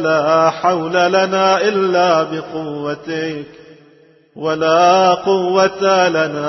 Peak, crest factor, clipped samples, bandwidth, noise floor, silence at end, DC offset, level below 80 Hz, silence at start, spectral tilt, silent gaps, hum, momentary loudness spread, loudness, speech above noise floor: 0 dBFS; 14 dB; under 0.1%; 6.2 kHz; -49 dBFS; 0 s; under 0.1%; -62 dBFS; 0 s; -4.5 dB/octave; none; none; 12 LU; -15 LUFS; 34 dB